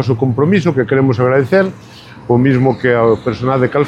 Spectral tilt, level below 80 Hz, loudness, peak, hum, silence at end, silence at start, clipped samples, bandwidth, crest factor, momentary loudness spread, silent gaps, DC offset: -8.5 dB/octave; -46 dBFS; -13 LUFS; 0 dBFS; none; 0 s; 0 s; under 0.1%; 8 kHz; 12 dB; 4 LU; none; under 0.1%